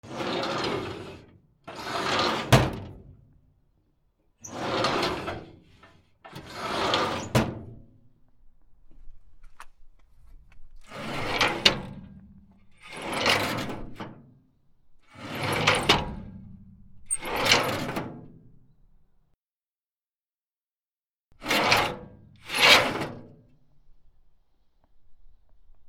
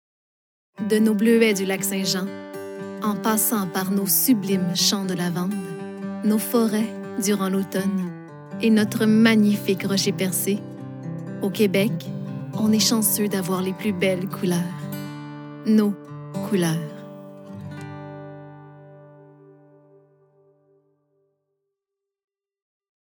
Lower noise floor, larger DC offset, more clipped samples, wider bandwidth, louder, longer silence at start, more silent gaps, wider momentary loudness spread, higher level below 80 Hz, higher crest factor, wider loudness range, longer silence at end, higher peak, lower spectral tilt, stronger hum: first, under -90 dBFS vs -85 dBFS; neither; neither; second, 17 kHz vs over 20 kHz; second, -25 LUFS vs -22 LUFS; second, 0.05 s vs 0.8 s; first, 19.39-19.43 s, 19.50-19.87 s, 20.02-20.24 s, 20.43-20.50 s, 20.57-21.12 s, 21.20-21.30 s vs none; first, 23 LU vs 18 LU; first, -50 dBFS vs -76 dBFS; first, 30 dB vs 20 dB; about the same, 9 LU vs 9 LU; second, 0 s vs 3.9 s; about the same, -2 dBFS vs -4 dBFS; about the same, -3.5 dB/octave vs -4.5 dB/octave; neither